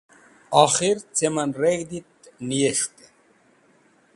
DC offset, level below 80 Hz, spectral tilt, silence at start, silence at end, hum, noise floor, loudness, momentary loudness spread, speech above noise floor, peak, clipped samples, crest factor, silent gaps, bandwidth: under 0.1%; -64 dBFS; -3.5 dB/octave; 0.5 s; 1.3 s; none; -59 dBFS; -22 LUFS; 14 LU; 38 dB; 0 dBFS; under 0.1%; 24 dB; none; 11.5 kHz